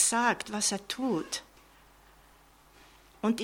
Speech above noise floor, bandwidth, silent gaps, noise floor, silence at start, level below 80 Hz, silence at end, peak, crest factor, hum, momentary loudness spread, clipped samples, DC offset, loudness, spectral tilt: 29 dB; 17 kHz; none; -59 dBFS; 0 s; -64 dBFS; 0 s; -12 dBFS; 20 dB; none; 9 LU; under 0.1%; under 0.1%; -30 LUFS; -2 dB/octave